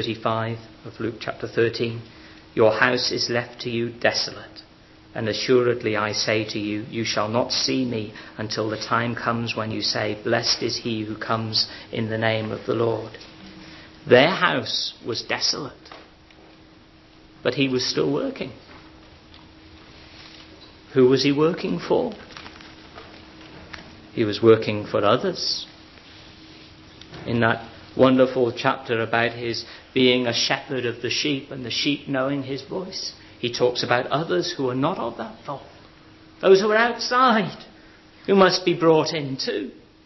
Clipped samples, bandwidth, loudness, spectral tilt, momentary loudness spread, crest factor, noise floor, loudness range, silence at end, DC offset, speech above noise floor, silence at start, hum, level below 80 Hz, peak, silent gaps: under 0.1%; 6.2 kHz; -22 LUFS; -4.5 dB/octave; 22 LU; 22 dB; -50 dBFS; 5 LU; 0.25 s; under 0.1%; 28 dB; 0 s; none; -56 dBFS; -2 dBFS; none